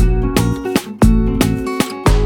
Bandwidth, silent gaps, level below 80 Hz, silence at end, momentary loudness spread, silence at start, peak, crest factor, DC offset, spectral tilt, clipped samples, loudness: 19.5 kHz; none; -18 dBFS; 0 s; 6 LU; 0 s; 0 dBFS; 14 dB; under 0.1%; -6 dB/octave; under 0.1%; -16 LUFS